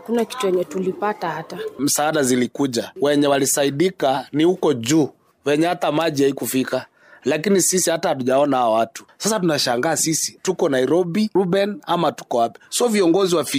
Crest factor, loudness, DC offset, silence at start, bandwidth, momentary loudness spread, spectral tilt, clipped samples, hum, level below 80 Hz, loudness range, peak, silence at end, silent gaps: 12 dB; -19 LUFS; under 0.1%; 0.05 s; 16 kHz; 7 LU; -4 dB/octave; under 0.1%; none; -66 dBFS; 1 LU; -8 dBFS; 0 s; none